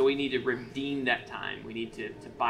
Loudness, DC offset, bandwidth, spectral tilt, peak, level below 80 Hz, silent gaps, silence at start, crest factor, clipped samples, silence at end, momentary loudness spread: -32 LUFS; under 0.1%; 10.5 kHz; -5.5 dB/octave; -14 dBFS; -60 dBFS; none; 0 s; 18 dB; under 0.1%; 0 s; 9 LU